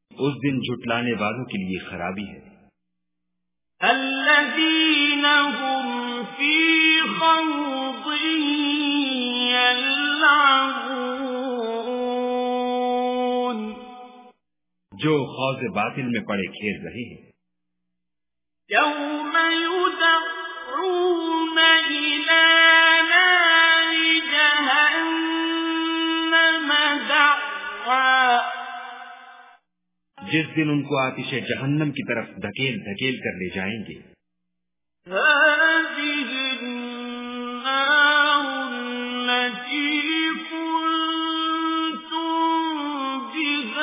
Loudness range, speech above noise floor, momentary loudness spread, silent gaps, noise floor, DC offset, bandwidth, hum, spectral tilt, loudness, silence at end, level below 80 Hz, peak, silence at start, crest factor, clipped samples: 11 LU; 65 dB; 14 LU; none; -88 dBFS; under 0.1%; 3.9 kHz; none; -1 dB/octave; -20 LUFS; 0 s; -64 dBFS; -2 dBFS; 0.15 s; 20 dB; under 0.1%